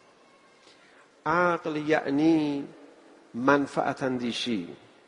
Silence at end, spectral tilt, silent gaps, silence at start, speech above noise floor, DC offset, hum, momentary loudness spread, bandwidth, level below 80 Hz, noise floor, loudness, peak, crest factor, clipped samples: 0.3 s; -5.5 dB/octave; none; 1.25 s; 32 dB; under 0.1%; none; 12 LU; 10.5 kHz; -68 dBFS; -58 dBFS; -27 LUFS; -6 dBFS; 22 dB; under 0.1%